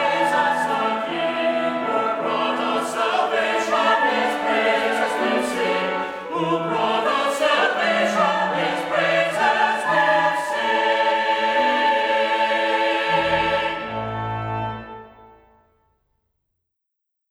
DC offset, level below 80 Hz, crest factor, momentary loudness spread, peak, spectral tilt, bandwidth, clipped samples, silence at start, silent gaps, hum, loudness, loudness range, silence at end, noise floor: under 0.1%; -56 dBFS; 16 dB; 7 LU; -6 dBFS; -4 dB/octave; 16 kHz; under 0.1%; 0 s; none; none; -20 LUFS; 5 LU; 2.05 s; -79 dBFS